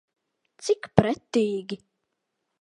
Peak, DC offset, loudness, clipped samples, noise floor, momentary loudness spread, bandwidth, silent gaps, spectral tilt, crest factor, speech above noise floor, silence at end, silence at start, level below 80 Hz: 0 dBFS; under 0.1%; -25 LUFS; under 0.1%; -80 dBFS; 14 LU; 11.5 kHz; none; -6 dB/octave; 28 dB; 55 dB; 0.85 s; 0.6 s; -54 dBFS